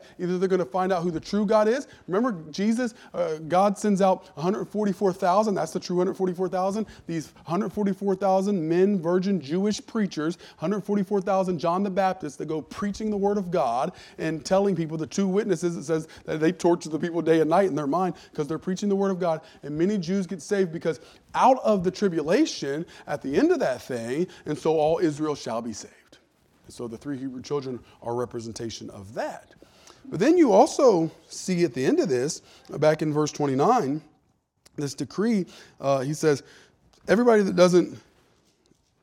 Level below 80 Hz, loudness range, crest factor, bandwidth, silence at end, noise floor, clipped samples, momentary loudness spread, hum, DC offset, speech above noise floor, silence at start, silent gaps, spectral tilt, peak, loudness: -62 dBFS; 5 LU; 20 dB; 14.5 kHz; 1.05 s; -68 dBFS; under 0.1%; 13 LU; none; under 0.1%; 44 dB; 0 s; none; -6 dB/octave; -6 dBFS; -25 LUFS